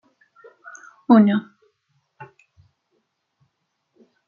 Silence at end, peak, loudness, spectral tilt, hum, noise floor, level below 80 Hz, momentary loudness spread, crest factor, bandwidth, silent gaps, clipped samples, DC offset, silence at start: 2.05 s; -4 dBFS; -17 LUFS; -7 dB/octave; none; -74 dBFS; -72 dBFS; 28 LU; 22 dB; 7 kHz; none; under 0.1%; under 0.1%; 1.1 s